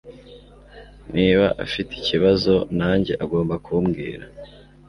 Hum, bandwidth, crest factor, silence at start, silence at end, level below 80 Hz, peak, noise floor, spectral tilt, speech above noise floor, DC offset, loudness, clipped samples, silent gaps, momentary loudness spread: 50 Hz at -40 dBFS; 11 kHz; 18 dB; 0.05 s; 0.4 s; -42 dBFS; -4 dBFS; -45 dBFS; -7.5 dB/octave; 25 dB; under 0.1%; -21 LUFS; under 0.1%; none; 12 LU